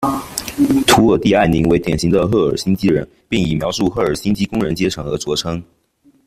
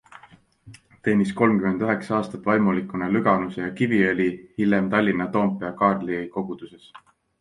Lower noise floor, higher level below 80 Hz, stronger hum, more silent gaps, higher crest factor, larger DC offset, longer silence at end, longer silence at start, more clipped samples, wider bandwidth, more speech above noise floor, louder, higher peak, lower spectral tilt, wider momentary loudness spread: about the same, -54 dBFS vs -53 dBFS; first, -38 dBFS vs -58 dBFS; neither; neither; about the same, 16 dB vs 18 dB; neither; first, 0.65 s vs 0.45 s; second, 0 s vs 0.65 s; neither; first, 16 kHz vs 10.5 kHz; first, 39 dB vs 31 dB; first, -16 LUFS vs -23 LUFS; first, 0 dBFS vs -4 dBFS; second, -5.5 dB/octave vs -8 dB/octave; about the same, 9 LU vs 9 LU